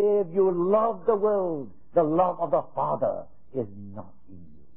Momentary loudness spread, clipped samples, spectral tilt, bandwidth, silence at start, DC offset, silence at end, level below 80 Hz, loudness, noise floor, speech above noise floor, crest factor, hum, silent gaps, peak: 14 LU; under 0.1%; -12.5 dB/octave; 3.5 kHz; 0 s; 0.8%; 0.3 s; -62 dBFS; -25 LUFS; -50 dBFS; 25 dB; 16 dB; none; none; -10 dBFS